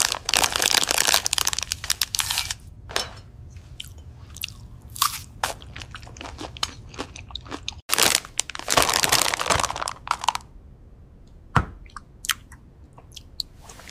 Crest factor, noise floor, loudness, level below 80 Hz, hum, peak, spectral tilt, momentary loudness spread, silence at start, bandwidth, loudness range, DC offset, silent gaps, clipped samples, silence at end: 26 dB; -47 dBFS; -23 LUFS; -44 dBFS; none; 0 dBFS; -1 dB/octave; 24 LU; 0 s; 16 kHz; 10 LU; under 0.1%; 7.82-7.89 s; under 0.1%; 0 s